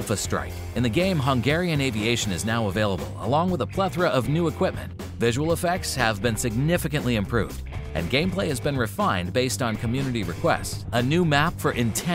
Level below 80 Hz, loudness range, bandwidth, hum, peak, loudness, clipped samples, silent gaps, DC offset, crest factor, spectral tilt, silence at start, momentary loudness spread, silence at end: -40 dBFS; 1 LU; 16 kHz; none; -4 dBFS; -24 LUFS; under 0.1%; none; under 0.1%; 20 dB; -5 dB/octave; 0 s; 5 LU; 0 s